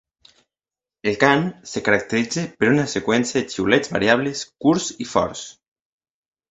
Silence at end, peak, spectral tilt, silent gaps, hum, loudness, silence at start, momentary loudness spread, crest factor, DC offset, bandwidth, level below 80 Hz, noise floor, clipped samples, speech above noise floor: 1 s; 0 dBFS; -4.5 dB/octave; none; none; -20 LUFS; 1.05 s; 9 LU; 22 dB; under 0.1%; 8.4 kHz; -54 dBFS; under -90 dBFS; under 0.1%; over 70 dB